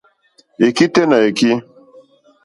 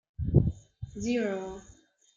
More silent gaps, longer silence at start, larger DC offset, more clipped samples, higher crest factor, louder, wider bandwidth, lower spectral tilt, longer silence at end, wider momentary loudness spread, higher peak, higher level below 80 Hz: neither; first, 0.6 s vs 0.2 s; neither; neither; about the same, 16 dB vs 20 dB; first, -14 LUFS vs -30 LUFS; first, 11.5 kHz vs 7.6 kHz; second, -5 dB/octave vs -7.5 dB/octave; first, 0.85 s vs 0.55 s; second, 5 LU vs 18 LU; first, 0 dBFS vs -10 dBFS; second, -60 dBFS vs -42 dBFS